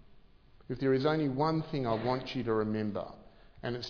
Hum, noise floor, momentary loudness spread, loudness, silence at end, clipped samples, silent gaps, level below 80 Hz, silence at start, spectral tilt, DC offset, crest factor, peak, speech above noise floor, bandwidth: none; -58 dBFS; 12 LU; -32 LUFS; 0 s; under 0.1%; none; -58 dBFS; 0.1 s; -6 dB/octave; under 0.1%; 18 dB; -16 dBFS; 27 dB; 5.4 kHz